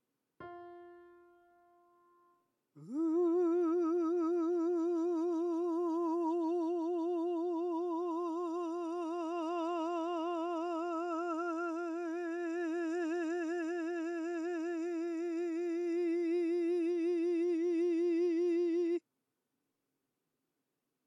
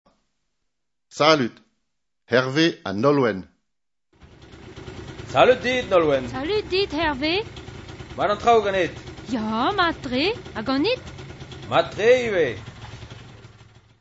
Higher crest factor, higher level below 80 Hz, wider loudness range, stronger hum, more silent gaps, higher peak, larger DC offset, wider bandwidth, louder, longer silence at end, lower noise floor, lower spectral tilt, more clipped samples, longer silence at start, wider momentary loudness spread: second, 10 dB vs 22 dB; second, under -90 dBFS vs -48 dBFS; about the same, 4 LU vs 3 LU; neither; neither; second, -26 dBFS vs -2 dBFS; neither; about the same, 7.8 kHz vs 8 kHz; second, -35 LUFS vs -21 LUFS; first, 2.05 s vs 0.55 s; about the same, -86 dBFS vs -84 dBFS; about the same, -5 dB/octave vs -5 dB/octave; neither; second, 0.4 s vs 1.15 s; second, 6 LU vs 21 LU